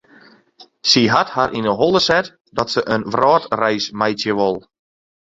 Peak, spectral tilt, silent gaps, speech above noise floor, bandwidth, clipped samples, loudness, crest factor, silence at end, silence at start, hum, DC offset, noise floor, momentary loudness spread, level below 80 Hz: 0 dBFS; -4 dB/octave; 2.41-2.45 s; 32 dB; 7.8 kHz; under 0.1%; -17 LUFS; 18 dB; 0.7 s; 0.6 s; none; under 0.1%; -49 dBFS; 7 LU; -52 dBFS